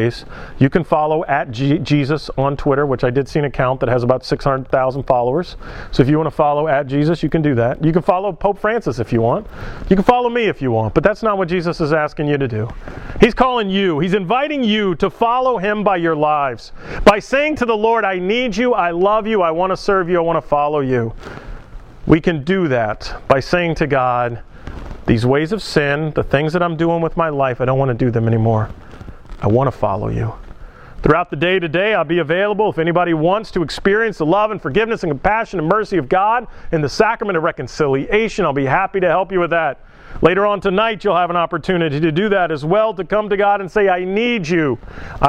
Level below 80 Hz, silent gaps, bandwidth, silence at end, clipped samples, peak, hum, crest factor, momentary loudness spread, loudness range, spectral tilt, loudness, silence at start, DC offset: -36 dBFS; none; 11.5 kHz; 0 s; under 0.1%; 0 dBFS; none; 16 dB; 6 LU; 2 LU; -7 dB/octave; -17 LUFS; 0 s; under 0.1%